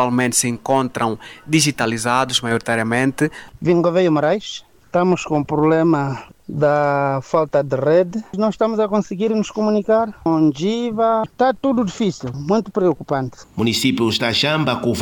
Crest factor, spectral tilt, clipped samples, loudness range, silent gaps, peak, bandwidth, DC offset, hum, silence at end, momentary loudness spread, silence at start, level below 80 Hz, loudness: 14 dB; -4.5 dB/octave; under 0.1%; 1 LU; none; -4 dBFS; 18 kHz; under 0.1%; none; 0 s; 7 LU; 0 s; -52 dBFS; -18 LUFS